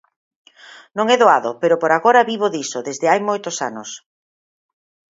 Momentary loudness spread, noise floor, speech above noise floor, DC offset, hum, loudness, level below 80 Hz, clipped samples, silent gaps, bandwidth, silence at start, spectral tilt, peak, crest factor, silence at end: 16 LU; -44 dBFS; 27 dB; under 0.1%; none; -17 LUFS; -72 dBFS; under 0.1%; none; 7.8 kHz; 0.95 s; -3 dB/octave; 0 dBFS; 18 dB; 1.15 s